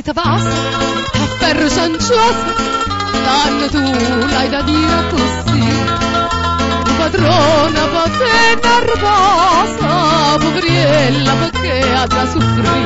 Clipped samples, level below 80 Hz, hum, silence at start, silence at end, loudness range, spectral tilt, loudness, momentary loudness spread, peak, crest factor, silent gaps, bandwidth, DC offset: under 0.1%; -30 dBFS; none; 0 s; 0 s; 3 LU; -4.5 dB/octave; -13 LUFS; 5 LU; -2 dBFS; 10 dB; none; 8 kHz; under 0.1%